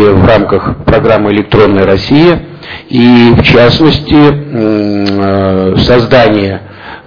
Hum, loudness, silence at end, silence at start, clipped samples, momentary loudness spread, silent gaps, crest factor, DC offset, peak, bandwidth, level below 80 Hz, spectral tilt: none; -7 LUFS; 0.1 s; 0 s; 6%; 9 LU; none; 6 dB; 1%; 0 dBFS; 5.4 kHz; -26 dBFS; -8 dB/octave